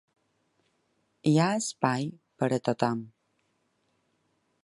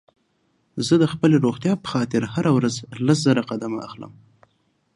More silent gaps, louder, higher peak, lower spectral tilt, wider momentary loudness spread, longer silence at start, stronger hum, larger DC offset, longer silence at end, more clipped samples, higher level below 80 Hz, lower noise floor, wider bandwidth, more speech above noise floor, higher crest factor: neither; second, -28 LUFS vs -21 LUFS; about the same, -6 dBFS vs -4 dBFS; about the same, -5.5 dB/octave vs -6 dB/octave; second, 8 LU vs 15 LU; first, 1.25 s vs 0.75 s; neither; neither; first, 1.55 s vs 0.85 s; neither; second, -72 dBFS vs -60 dBFS; first, -74 dBFS vs -67 dBFS; about the same, 11.5 kHz vs 11.5 kHz; about the same, 47 dB vs 46 dB; first, 24 dB vs 18 dB